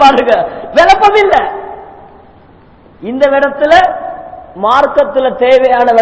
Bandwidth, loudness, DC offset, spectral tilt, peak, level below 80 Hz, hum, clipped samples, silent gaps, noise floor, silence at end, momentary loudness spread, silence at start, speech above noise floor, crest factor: 8 kHz; -9 LUFS; under 0.1%; -4 dB/octave; 0 dBFS; -40 dBFS; none; 3%; none; -40 dBFS; 0 s; 19 LU; 0 s; 32 dB; 10 dB